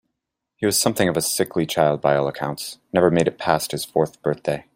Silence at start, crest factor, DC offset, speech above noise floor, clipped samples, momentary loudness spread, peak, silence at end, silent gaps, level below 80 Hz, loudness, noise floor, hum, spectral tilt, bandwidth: 0.6 s; 20 dB; under 0.1%; 60 dB; under 0.1%; 7 LU; -2 dBFS; 0.15 s; none; -56 dBFS; -21 LUFS; -81 dBFS; none; -4 dB/octave; 16 kHz